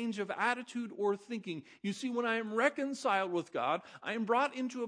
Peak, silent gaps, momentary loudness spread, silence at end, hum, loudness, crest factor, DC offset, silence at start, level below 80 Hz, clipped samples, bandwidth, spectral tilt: -14 dBFS; none; 9 LU; 0 s; none; -35 LUFS; 20 dB; under 0.1%; 0 s; -88 dBFS; under 0.1%; 10.5 kHz; -4.5 dB/octave